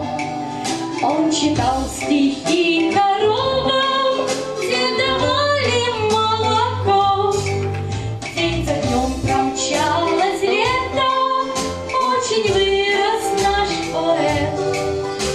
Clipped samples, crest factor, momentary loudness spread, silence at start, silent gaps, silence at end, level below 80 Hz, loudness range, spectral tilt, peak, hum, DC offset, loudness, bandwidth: under 0.1%; 14 dB; 6 LU; 0 s; none; 0 s; -38 dBFS; 2 LU; -4 dB/octave; -4 dBFS; none; under 0.1%; -18 LUFS; 13.5 kHz